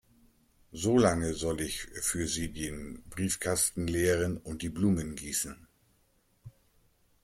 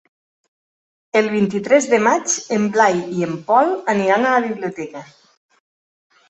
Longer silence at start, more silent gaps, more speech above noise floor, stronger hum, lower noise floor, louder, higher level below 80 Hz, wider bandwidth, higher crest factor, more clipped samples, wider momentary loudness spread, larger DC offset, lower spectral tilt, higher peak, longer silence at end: second, 0.7 s vs 1.15 s; neither; second, 39 dB vs over 73 dB; neither; second, -70 dBFS vs under -90 dBFS; second, -31 LUFS vs -17 LUFS; first, -52 dBFS vs -64 dBFS; first, 16.5 kHz vs 8.4 kHz; about the same, 20 dB vs 18 dB; neither; about the same, 12 LU vs 10 LU; neither; about the same, -4.5 dB/octave vs -4.5 dB/octave; second, -12 dBFS vs -2 dBFS; second, 0.75 s vs 1.25 s